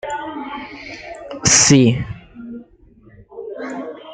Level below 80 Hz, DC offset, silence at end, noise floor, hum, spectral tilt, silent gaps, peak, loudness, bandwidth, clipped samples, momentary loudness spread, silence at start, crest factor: -46 dBFS; under 0.1%; 0 s; -48 dBFS; none; -3.5 dB/octave; none; 0 dBFS; -14 LUFS; 11 kHz; under 0.1%; 24 LU; 0.05 s; 20 dB